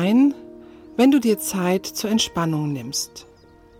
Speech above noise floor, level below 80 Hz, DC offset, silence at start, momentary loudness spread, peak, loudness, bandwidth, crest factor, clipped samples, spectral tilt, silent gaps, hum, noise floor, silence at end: 23 dB; -56 dBFS; under 0.1%; 0 s; 11 LU; -6 dBFS; -21 LUFS; 18 kHz; 14 dB; under 0.1%; -4.5 dB/octave; none; none; -42 dBFS; 0.55 s